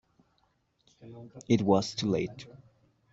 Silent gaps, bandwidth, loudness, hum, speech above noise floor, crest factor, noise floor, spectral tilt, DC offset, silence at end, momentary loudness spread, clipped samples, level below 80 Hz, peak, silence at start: none; 8 kHz; -29 LUFS; none; 43 dB; 22 dB; -73 dBFS; -6 dB/octave; under 0.1%; 0.55 s; 24 LU; under 0.1%; -66 dBFS; -10 dBFS; 1.05 s